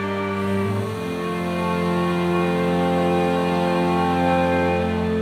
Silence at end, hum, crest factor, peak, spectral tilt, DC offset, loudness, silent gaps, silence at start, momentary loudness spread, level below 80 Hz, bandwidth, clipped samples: 0 s; none; 14 dB; -6 dBFS; -7 dB/octave; under 0.1%; -21 LUFS; none; 0 s; 5 LU; -46 dBFS; 14.5 kHz; under 0.1%